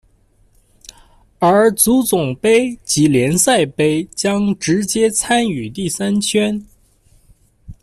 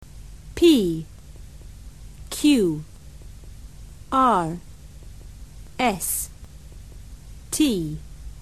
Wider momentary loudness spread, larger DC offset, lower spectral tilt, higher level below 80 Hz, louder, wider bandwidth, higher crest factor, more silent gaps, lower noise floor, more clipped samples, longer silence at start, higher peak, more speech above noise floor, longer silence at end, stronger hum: second, 7 LU vs 26 LU; second, under 0.1% vs 0.4%; about the same, -4 dB/octave vs -4.5 dB/octave; second, -48 dBFS vs -42 dBFS; first, -15 LUFS vs -22 LUFS; first, 15.5 kHz vs 13 kHz; about the same, 16 dB vs 20 dB; neither; first, -54 dBFS vs -42 dBFS; neither; first, 1.4 s vs 0.15 s; first, 0 dBFS vs -6 dBFS; first, 39 dB vs 22 dB; about the same, 0.1 s vs 0 s; neither